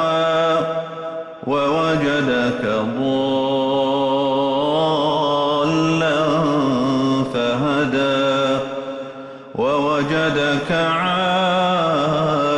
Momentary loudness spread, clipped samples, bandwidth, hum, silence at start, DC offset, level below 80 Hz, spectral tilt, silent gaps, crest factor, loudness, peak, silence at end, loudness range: 7 LU; under 0.1%; 11 kHz; none; 0 s; under 0.1%; -52 dBFS; -6 dB/octave; none; 10 dB; -18 LUFS; -8 dBFS; 0 s; 2 LU